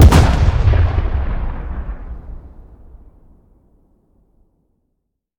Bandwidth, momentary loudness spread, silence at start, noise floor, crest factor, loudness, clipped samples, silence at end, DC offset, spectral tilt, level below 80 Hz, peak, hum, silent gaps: 15 kHz; 22 LU; 0 s; -72 dBFS; 16 dB; -16 LUFS; under 0.1%; 2.9 s; under 0.1%; -6.5 dB/octave; -20 dBFS; 0 dBFS; none; none